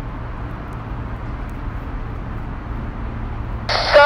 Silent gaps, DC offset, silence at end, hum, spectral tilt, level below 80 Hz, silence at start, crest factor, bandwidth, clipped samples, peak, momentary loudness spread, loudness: none; under 0.1%; 0 s; none; -5.5 dB/octave; -30 dBFS; 0 s; 20 dB; 11.5 kHz; under 0.1%; 0 dBFS; 9 LU; -26 LUFS